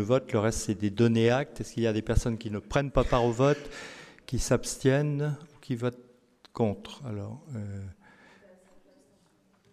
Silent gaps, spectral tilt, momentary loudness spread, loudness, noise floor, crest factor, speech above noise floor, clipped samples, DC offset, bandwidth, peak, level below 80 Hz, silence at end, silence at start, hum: none; -6 dB/octave; 15 LU; -29 LUFS; -65 dBFS; 20 dB; 38 dB; under 0.1%; under 0.1%; 14.5 kHz; -8 dBFS; -42 dBFS; 1.8 s; 0 s; none